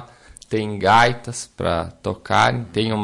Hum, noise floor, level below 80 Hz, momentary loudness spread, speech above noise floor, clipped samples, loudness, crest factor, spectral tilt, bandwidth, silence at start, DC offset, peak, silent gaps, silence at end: none; -44 dBFS; -48 dBFS; 14 LU; 25 dB; under 0.1%; -20 LUFS; 16 dB; -4.5 dB/octave; 11.5 kHz; 0 s; under 0.1%; -4 dBFS; none; 0 s